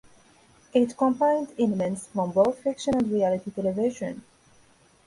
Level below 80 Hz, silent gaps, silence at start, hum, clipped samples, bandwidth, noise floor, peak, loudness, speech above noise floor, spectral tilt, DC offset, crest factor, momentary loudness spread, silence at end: -62 dBFS; none; 0.75 s; none; under 0.1%; 11.5 kHz; -59 dBFS; -8 dBFS; -26 LUFS; 34 dB; -6.5 dB/octave; under 0.1%; 18 dB; 6 LU; 0.85 s